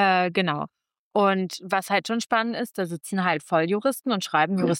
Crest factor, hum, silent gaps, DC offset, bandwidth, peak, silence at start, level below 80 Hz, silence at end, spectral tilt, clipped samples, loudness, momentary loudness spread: 16 dB; none; 0.99-1.11 s; under 0.1%; 17 kHz; -8 dBFS; 0 s; -74 dBFS; 0 s; -5 dB/octave; under 0.1%; -24 LUFS; 7 LU